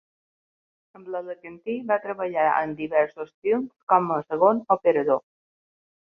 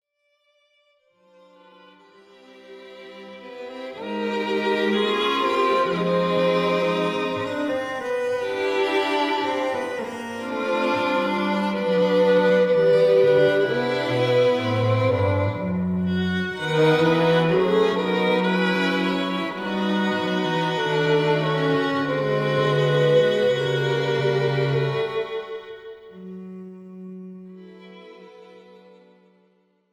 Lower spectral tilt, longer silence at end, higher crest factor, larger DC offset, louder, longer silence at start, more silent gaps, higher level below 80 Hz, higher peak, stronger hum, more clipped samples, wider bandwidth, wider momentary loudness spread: first, -9 dB/octave vs -6.5 dB/octave; second, 0.9 s vs 1.35 s; about the same, 20 dB vs 16 dB; neither; second, -24 LUFS vs -21 LUFS; second, 1 s vs 2.65 s; first, 3.34-3.42 s, 3.83-3.87 s vs none; second, -70 dBFS vs -62 dBFS; first, -4 dBFS vs -8 dBFS; neither; neither; second, 5.2 kHz vs 12.5 kHz; second, 12 LU vs 20 LU